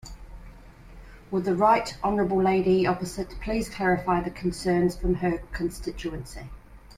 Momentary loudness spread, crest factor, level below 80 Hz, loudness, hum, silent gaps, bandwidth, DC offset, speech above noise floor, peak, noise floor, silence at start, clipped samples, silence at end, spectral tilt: 14 LU; 18 dB; -42 dBFS; -26 LUFS; none; none; 15 kHz; under 0.1%; 21 dB; -8 dBFS; -47 dBFS; 0.05 s; under 0.1%; 0.05 s; -6.5 dB/octave